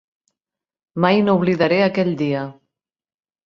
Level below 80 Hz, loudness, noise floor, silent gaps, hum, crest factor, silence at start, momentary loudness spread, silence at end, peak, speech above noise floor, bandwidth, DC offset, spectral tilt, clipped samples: -60 dBFS; -18 LUFS; -88 dBFS; none; none; 18 dB; 0.95 s; 12 LU; 0.95 s; -2 dBFS; 71 dB; 6.6 kHz; under 0.1%; -8 dB/octave; under 0.1%